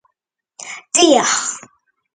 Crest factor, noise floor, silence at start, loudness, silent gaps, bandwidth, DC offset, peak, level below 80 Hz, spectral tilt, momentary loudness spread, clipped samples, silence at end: 18 dB; -75 dBFS; 0.6 s; -14 LUFS; none; 9.6 kHz; under 0.1%; 0 dBFS; -64 dBFS; -1 dB/octave; 20 LU; under 0.1%; 0.55 s